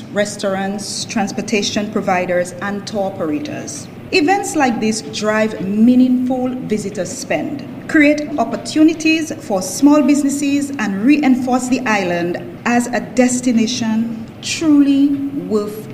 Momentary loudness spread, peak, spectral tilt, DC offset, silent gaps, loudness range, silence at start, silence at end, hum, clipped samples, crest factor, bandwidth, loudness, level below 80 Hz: 10 LU; 0 dBFS; -4.5 dB/octave; under 0.1%; none; 4 LU; 0 s; 0 s; none; under 0.1%; 16 dB; 15.5 kHz; -16 LUFS; -54 dBFS